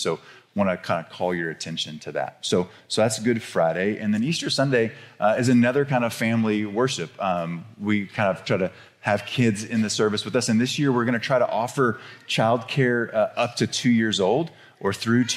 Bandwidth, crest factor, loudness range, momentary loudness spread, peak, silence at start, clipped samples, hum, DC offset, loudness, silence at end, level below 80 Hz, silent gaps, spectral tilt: 14 kHz; 16 dB; 3 LU; 8 LU; -8 dBFS; 0 s; under 0.1%; none; under 0.1%; -23 LUFS; 0 s; -68 dBFS; none; -5 dB/octave